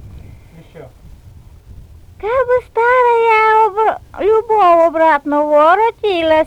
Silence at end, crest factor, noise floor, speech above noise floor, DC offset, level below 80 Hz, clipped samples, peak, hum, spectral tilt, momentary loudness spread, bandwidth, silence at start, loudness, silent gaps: 0 s; 12 dB; -39 dBFS; 27 dB; under 0.1%; -42 dBFS; under 0.1%; -2 dBFS; none; -5.5 dB/octave; 7 LU; 10.5 kHz; 0 s; -12 LUFS; none